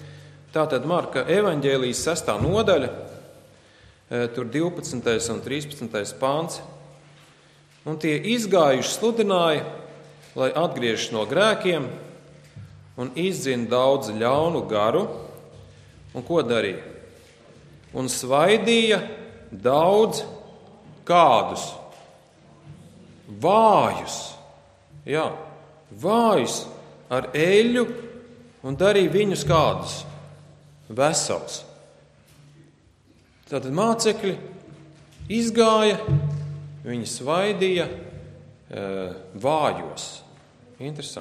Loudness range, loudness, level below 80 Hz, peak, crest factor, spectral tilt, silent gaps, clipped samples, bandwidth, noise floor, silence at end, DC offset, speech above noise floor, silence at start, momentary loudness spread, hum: 6 LU; -22 LUFS; -54 dBFS; -4 dBFS; 20 dB; -4.5 dB/octave; none; under 0.1%; 14.5 kHz; -57 dBFS; 0 s; under 0.1%; 35 dB; 0 s; 20 LU; none